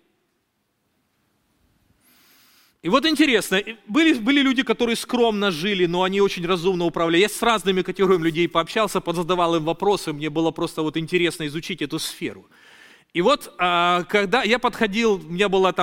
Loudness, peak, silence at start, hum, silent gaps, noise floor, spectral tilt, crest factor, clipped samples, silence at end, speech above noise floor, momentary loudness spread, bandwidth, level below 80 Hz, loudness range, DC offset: -21 LUFS; -2 dBFS; 2.85 s; none; none; -71 dBFS; -4.5 dB/octave; 20 dB; under 0.1%; 0 s; 51 dB; 8 LU; 17 kHz; -52 dBFS; 5 LU; under 0.1%